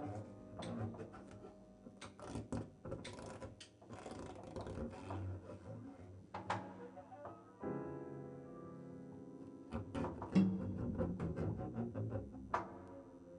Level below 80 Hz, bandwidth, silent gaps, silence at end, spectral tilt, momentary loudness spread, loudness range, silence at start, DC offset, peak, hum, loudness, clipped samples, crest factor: -64 dBFS; 10.5 kHz; none; 0 s; -7.5 dB/octave; 13 LU; 9 LU; 0 s; under 0.1%; -20 dBFS; none; -46 LUFS; under 0.1%; 24 dB